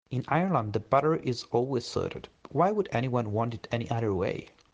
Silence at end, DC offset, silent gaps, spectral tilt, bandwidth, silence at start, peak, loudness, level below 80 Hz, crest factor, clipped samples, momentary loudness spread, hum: 0.3 s; under 0.1%; none; -7 dB/octave; 9.2 kHz; 0.1 s; -10 dBFS; -29 LUFS; -60 dBFS; 20 dB; under 0.1%; 8 LU; none